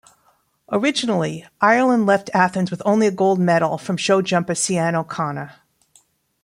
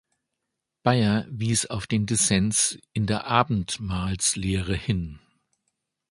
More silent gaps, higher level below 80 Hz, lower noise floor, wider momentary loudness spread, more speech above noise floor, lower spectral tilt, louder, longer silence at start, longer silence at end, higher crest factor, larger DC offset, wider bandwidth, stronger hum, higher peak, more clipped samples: neither; second, -64 dBFS vs -44 dBFS; second, -62 dBFS vs -83 dBFS; about the same, 9 LU vs 8 LU; second, 43 dB vs 58 dB; about the same, -5 dB/octave vs -4 dB/octave; first, -19 LUFS vs -24 LUFS; second, 0.7 s vs 0.85 s; about the same, 0.9 s vs 0.95 s; about the same, 18 dB vs 22 dB; neither; first, 14.5 kHz vs 11.5 kHz; neither; about the same, -2 dBFS vs -2 dBFS; neither